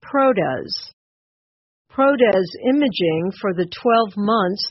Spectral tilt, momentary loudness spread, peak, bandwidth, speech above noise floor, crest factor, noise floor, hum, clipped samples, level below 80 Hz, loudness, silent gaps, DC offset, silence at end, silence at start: -4 dB/octave; 10 LU; -4 dBFS; 6 kHz; over 72 dB; 16 dB; under -90 dBFS; none; under 0.1%; -60 dBFS; -19 LUFS; 0.93-1.85 s; under 0.1%; 0 s; 0.05 s